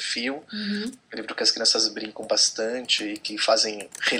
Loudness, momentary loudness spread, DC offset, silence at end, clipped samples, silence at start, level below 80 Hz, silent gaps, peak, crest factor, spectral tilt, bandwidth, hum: -23 LUFS; 12 LU; under 0.1%; 0 s; under 0.1%; 0 s; -72 dBFS; none; -6 dBFS; 20 dB; -1 dB/octave; 16 kHz; none